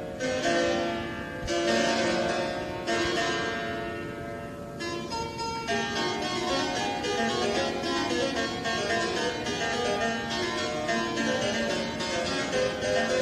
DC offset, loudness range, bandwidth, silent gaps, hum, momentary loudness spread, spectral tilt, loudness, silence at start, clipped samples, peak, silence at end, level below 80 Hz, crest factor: under 0.1%; 3 LU; 14.5 kHz; none; none; 7 LU; -3.5 dB/octave; -28 LUFS; 0 s; under 0.1%; -12 dBFS; 0 s; -52 dBFS; 16 dB